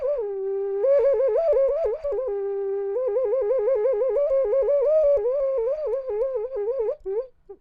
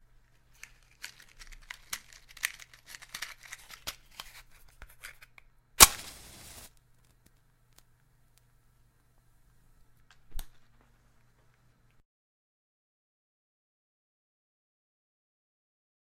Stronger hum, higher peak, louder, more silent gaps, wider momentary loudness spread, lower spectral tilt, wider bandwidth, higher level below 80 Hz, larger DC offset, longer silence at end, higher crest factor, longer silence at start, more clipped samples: neither; second, -12 dBFS vs 0 dBFS; first, -23 LUFS vs -26 LUFS; neither; second, 8 LU vs 32 LU; first, -7.5 dB/octave vs 0.5 dB/octave; second, 4.9 kHz vs 16 kHz; about the same, -52 dBFS vs -52 dBFS; neither; second, 0.05 s vs 5.55 s; second, 10 dB vs 38 dB; second, 0 s vs 1.9 s; neither